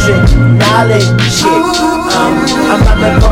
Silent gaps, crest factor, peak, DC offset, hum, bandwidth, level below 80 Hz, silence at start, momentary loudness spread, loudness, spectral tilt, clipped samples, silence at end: none; 8 dB; 0 dBFS; under 0.1%; none; 16 kHz; -16 dBFS; 0 s; 3 LU; -9 LUFS; -5.5 dB/octave; 0.6%; 0 s